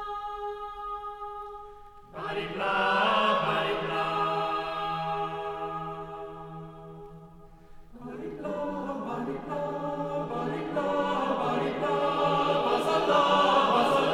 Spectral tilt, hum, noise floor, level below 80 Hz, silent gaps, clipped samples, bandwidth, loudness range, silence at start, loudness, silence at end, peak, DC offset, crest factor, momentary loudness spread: -5 dB/octave; none; -50 dBFS; -56 dBFS; none; under 0.1%; 14 kHz; 12 LU; 0 s; -28 LUFS; 0 s; -10 dBFS; under 0.1%; 18 dB; 19 LU